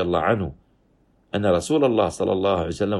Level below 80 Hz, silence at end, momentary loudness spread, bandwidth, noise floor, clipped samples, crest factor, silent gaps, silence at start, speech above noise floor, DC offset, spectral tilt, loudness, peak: -48 dBFS; 0 s; 6 LU; 12.5 kHz; -61 dBFS; under 0.1%; 16 dB; none; 0 s; 40 dB; under 0.1%; -6 dB/octave; -22 LUFS; -6 dBFS